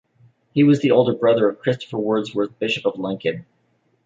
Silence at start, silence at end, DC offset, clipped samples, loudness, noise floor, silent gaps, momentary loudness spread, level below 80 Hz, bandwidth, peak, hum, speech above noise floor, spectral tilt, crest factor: 0.55 s; 0.65 s; under 0.1%; under 0.1%; -20 LUFS; -65 dBFS; none; 10 LU; -64 dBFS; 7.6 kHz; -2 dBFS; none; 46 dB; -7 dB/octave; 18 dB